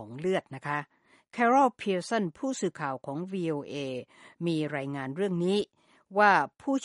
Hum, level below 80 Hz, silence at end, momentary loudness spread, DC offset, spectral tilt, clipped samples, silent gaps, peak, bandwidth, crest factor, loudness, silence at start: none; -74 dBFS; 0 s; 13 LU; under 0.1%; -5.5 dB/octave; under 0.1%; none; -8 dBFS; 11.5 kHz; 22 dB; -29 LUFS; 0 s